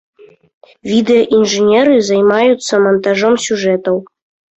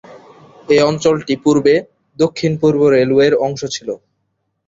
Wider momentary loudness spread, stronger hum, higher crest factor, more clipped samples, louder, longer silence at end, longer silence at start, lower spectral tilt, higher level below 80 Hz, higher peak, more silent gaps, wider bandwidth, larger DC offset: second, 6 LU vs 11 LU; neither; about the same, 12 dB vs 14 dB; neither; about the same, -12 LUFS vs -14 LUFS; second, 0.55 s vs 0.7 s; first, 0.85 s vs 0.1 s; about the same, -4.5 dB/octave vs -5.5 dB/octave; about the same, -56 dBFS vs -54 dBFS; about the same, -2 dBFS vs -2 dBFS; neither; about the same, 8.2 kHz vs 7.8 kHz; neither